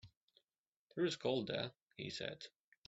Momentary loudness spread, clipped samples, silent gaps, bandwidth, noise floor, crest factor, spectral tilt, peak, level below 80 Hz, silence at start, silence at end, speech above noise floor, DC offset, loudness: 14 LU; under 0.1%; 0.17-0.28 s, 0.58-0.87 s, 1.82-1.86 s; 8 kHz; under -90 dBFS; 20 dB; -3.5 dB/octave; -24 dBFS; -78 dBFS; 0.05 s; 0.4 s; over 49 dB; under 0.1%; -42 LUFS